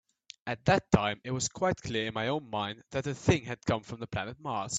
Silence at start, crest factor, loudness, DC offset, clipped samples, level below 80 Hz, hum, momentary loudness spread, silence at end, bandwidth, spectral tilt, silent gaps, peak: 0.45 s; 26 dB; -31 LUFS; under 0.1%; under 0.1%; -54 dBFS; none; 9 LU; 0 s; 9.4 kHz; -4.5 dB/octave; none; -6 dBFS